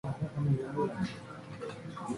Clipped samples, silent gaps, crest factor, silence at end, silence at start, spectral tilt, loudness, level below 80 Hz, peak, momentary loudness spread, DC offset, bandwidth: under 0.1%; none; 18 dB; 0 s; 0.05 s; -7.5 dB/octave; -36 LUFS; -60 dBFS; -18 dBFS; 12 LU; under 0.1%; 11.5 kHz